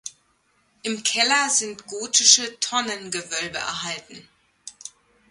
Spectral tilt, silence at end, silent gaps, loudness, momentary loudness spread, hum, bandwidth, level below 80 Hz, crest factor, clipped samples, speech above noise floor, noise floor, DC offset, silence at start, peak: 0.5 dB/octave; 0.4 s; none; -20 LUFS; 24 LU; none; 11.5 kHz; -66 dBFS; 24 dB; under 0.1%; 42 dB; -65 dBFS; under 0.1%; 0.05 s; 0 dBFS